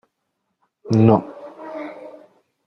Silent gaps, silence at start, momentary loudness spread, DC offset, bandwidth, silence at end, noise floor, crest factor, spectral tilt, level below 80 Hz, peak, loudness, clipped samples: none; 0.85 s; 24 LU; under 0.1%; 6.6 kHz; 0.55 s; -75 dBFS; 22 dB; -9.5 dB/octave; -58 dBFS; 0 dBFS; -17 LUFS; under 0.1%